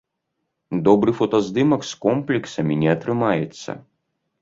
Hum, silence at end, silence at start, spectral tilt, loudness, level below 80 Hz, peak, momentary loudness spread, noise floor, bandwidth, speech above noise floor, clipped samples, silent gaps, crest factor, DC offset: none; 0.6 s; 0.7 s; -6.5 dB/octave; -20 LUFS; -58 dBFS; -2 dBFS; 12 LU; -77 dBFS; 7.8 kHz; 57 dB; under 0.1%; none; 18 dB; under 0.1%